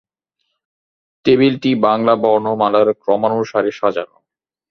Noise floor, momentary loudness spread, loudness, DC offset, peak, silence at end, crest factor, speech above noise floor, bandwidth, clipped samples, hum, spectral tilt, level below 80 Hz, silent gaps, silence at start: -79 dBFS; 7 LU; -16 LUFS; under 0.1%; 0 dBFS; 0.65 s; 16 dB; 64 dB; 6.4 kHz; under 0.1%; none; -7 dB/octave; -58 dBFS; none; 1.25 s